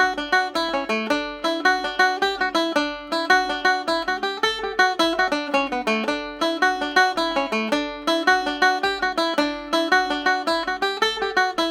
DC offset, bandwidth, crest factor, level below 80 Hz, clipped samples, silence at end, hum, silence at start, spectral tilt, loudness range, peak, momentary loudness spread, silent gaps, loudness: under 0.1%; 16.5 kHz; 18 dB; -52 dBFS; under 0.1%; 0 s; none; 0 s; -2 dB/octave; 1 LU; -2 dBFS; 5 LU; none; -21 LUFS